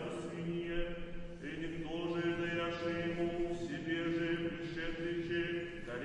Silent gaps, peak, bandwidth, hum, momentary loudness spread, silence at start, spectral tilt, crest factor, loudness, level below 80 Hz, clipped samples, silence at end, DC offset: none; -24 dBFS; 9.8 kHz; none; 7 LU; 0 s; -6.5 dB/octave; 14 dB; -39 LUFS; -52 dBFS; under 0.1%; 0 s; under 0.1%